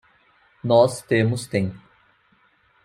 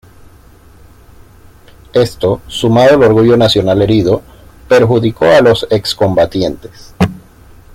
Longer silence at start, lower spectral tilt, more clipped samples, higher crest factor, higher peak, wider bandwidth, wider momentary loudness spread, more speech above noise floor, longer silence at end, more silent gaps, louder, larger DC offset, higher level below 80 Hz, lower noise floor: second, 0.65 s vs 1.95 s; about the same, -6 dB/octave vs -6.5 dB/octave; neither; first, 20 dB vs 12 dB; about the same, -2 dBFS vs 0 dBFS; about the same, 15.5 kHz vs 16 kHz; about the same, 11 LU vs 9 LU; first, 41 dB vs 31 dB; first, 1.05 s vs 0.55 s; neither; second, -21 LUFS vs -11 LUFS; neither; second, -62 dBFS vs -38 dBFS; first, -61 dBFS vs -40 dBFS